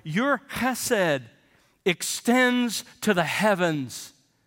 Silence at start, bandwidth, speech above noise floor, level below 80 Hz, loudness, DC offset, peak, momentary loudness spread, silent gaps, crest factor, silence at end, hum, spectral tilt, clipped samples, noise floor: 0.05 s; 17 kHz; 38 dB; -64 dBFS; -24 LUFS; under 0.1%; -8 dBFS; 10 LU; none; 18 dB; 0.35 s; none; -4 dB/octave; under 0.1%; -62 dBFS